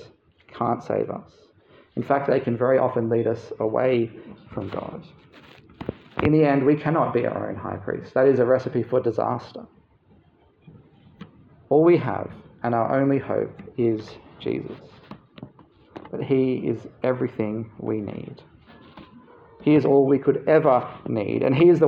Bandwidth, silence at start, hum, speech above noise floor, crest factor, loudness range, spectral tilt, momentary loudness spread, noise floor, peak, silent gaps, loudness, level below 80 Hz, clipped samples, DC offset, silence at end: 6.8 kHz; 0 s; none; 36 dB; 18 dB; 6 LU; -9.5 dB/octave; 18 LU; -58 dBFS; -4 dBFS; none; -23 LUFS; -60 dBFS; under 0.1%; under 0.1%; 0 s